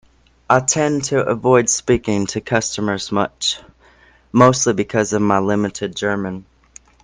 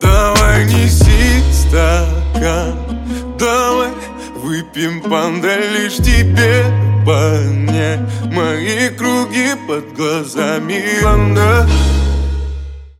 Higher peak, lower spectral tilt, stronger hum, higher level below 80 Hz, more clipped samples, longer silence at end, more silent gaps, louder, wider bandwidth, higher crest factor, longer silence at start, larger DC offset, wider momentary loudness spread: about the same, 0 dBFS vs 0 dBFS; second, -4 dB/octave vs -5.5 dB/octave; neither; second, -48 dBFS vs -18 dBFS; neither; first, 0.6 s vs 0.1 s; neither; second, -17 LUFS vs -14 LUFS; second, 10.5 kHz vs 16.5 kHz; first, 18 dB vs 12 dB; first, 0.5 s vs 0 s; neither; second, 8 LU vs 11 LU